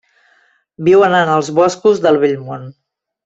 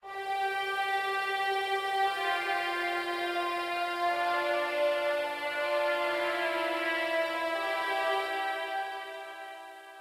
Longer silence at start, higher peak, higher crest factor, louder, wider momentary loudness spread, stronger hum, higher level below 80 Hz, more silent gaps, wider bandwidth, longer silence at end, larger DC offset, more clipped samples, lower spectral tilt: first, 0.8 s vs 0.05 s; first, -2 dBFS vs -18 dBFS; about the same, 12 dB vs 14 dB; first, -13 LUFS vs -30 LUFS; first, 13 LU vs 6 LU; neither; first, -58 dBFS vs -76 dBFS; neither; second, 8 kHz vs 16.5 kHz; first, 0.55 s vs 0 s; neither; neither; first, -5.5 dB/octave vs -1.5 dB/octave